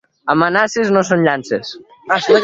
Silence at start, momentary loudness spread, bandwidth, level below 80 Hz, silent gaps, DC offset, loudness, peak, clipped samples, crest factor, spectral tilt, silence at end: 0.25 s; 9 LU; 7.8 kHz; -58 dBFS; none; under 0.1%; -15 LUFS; 0 dBFS; under 0.1%; 16 dB; -5 dB/octave; 0 s